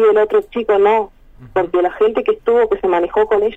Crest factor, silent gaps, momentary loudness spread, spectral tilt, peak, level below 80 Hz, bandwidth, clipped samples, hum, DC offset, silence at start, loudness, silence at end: 12 dB; none; 5 LU; -6.5 dB/octave; -4 dBFS; -46 dBFS; 3.9 kHz; under 0.1%; none; under 0.1%; 0 s; -15 LUFS; 0 s